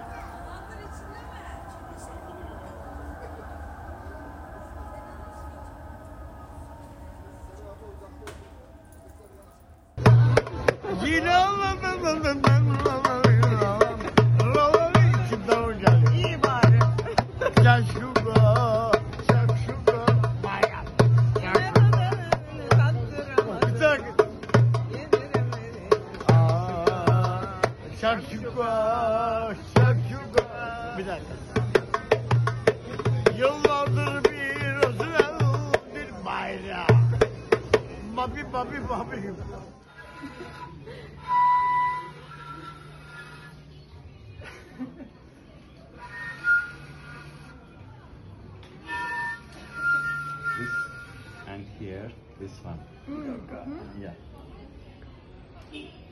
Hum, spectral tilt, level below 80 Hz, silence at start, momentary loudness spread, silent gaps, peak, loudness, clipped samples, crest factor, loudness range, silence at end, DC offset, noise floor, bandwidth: none; -7 dB/octave; -46 dBFS; 0 s; 23 LU; none; -4 dBFS; -23 LUFS; under 0.1%; 22 dB; 20 LU; 0.1 s; under 0.1%; -51 dBFS; 11.5 kHz